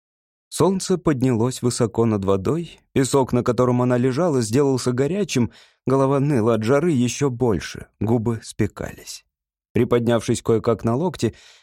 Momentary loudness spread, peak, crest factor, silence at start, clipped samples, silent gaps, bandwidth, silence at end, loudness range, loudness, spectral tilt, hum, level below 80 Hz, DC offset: 8 LU; -6 dBFS; 14 dB; 0.5 s; under 0.1%; 9.70-9.75 s; 15.5 kHz; 0.3 s; 3 LU; -21 LUFS; -6.5 dB/octave; none; -50 dBFS; under 0.1%